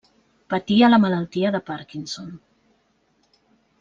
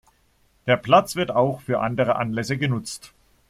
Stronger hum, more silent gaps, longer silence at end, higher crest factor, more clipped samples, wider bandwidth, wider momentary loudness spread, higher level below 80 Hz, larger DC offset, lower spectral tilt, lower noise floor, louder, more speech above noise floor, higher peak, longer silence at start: neither; neither; first, 1.45 s vs 0.45 s; about the same, 18 dB vs 20 dB; neither; second, 7.4 kHz vs 15.5 kHz; first, 17 LU vs 13 LU; second, -62 dBFS vs -56 dBFS; neither; about the same, -6 dB/octave vs -5.5 dB/octave; about the same, -65 dBFS vs -62 dBFS; about the same, -21 LUFS vs -22 LUFS; first, 45 dB vs 41 dB; about the same, -4 dBFS vs -2 dBFS; second, 0.5 s vs 0.65 s